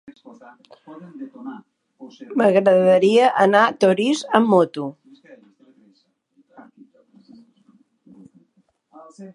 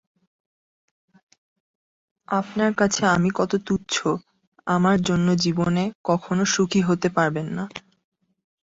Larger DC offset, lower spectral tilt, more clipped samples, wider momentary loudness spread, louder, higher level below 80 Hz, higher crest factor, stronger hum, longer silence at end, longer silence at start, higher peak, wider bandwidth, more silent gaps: neither; about the same, -5.5 dB/octave vs -5 dB/octave; neither; first, 23 LU vs 9 LU; first, -17 LUFS vs -22 LUFS; second, -72 dBFS vs -56 dBFS; about the same, 20 dB vs 18 dB; neither; second, 0.1 s vs 0.85 s; second, 0.9 s vs 2.3 s; first, 0 dBFS vs -6 dBFS; first, 11.5 kHz vs 8 kHz; second, none vs 4.47-4.52 s, 5.95-6.04 s